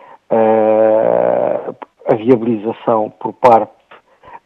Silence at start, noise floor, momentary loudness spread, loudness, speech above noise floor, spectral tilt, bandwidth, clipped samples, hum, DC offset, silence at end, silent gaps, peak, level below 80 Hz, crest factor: 0.3 s; -45 dBFS; 12 LU; -14 LUFS; 32 dB; -8.5 dB/octave; 6 kHz; 0.1%; none; under 0.1%; 0.1 s; none; 0 dBFS; -62 dBFS; 14 dB